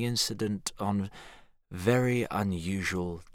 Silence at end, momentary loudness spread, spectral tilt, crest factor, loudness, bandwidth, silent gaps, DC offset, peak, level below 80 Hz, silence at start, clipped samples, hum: 0.05 s; 10 LU; -5 dB/octave; 20 dB; -30 LUFS; 17.5 kHz; none; under 0.1%; -12 dBFS; -56 dBFS; 0 s; under 0.1%; none